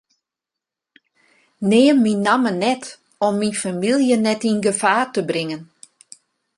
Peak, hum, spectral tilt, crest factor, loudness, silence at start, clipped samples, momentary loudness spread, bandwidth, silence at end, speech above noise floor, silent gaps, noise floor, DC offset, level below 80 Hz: -2 dBFS; none; -4.5 dB/octave; 18 dB; -18 LUFS; 1.6 s; under 0.1%; 10 LU; 11.5 kHz; 0.95 s; 68 dB; none; -86 dBFS; under 0.1%; -66 dBFS